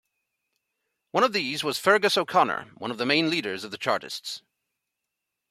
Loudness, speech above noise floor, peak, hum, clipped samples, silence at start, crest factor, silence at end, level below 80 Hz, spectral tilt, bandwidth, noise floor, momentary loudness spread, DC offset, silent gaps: -25 LUFS; 59 dB; -4 dBFS; none; under 0.1%; 1.15 s; 22 dB; 1.1 s; -74 dBFS; -3.5 dB/octave; 16 kHz; -84 dBFS; 13 LU; under 0.1%; none